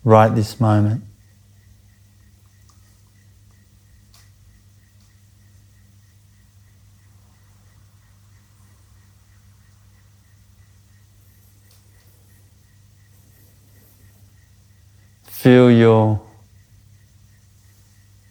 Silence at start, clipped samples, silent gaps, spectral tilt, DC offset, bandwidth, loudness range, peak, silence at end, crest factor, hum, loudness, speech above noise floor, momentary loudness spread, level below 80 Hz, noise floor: 0.05 s; under 0.1%; none; -8 dB/octave; under 0.1%; over 20 kHz; 9 LU; 0 dBFS; 2.1 s; 22 dB; none; -15 LUFS; 39 dB; 15 LU; -56 dBFS; -52 dBFS